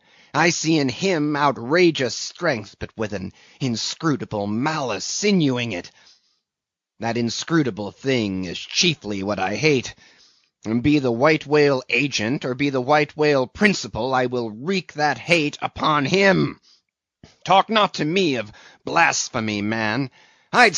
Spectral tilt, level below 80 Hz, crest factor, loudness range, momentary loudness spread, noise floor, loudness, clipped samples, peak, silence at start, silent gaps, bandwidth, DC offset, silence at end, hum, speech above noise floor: -3.5 dB/octave; -54 dBFS; 20 dB; 4 LU; 10 LU; -87 dBFS; -21 LUFS; under 0.1%; 0 dBFS; 0.35 s; none; 8 kHz; under 0.1%; 0 s; none; 66 dB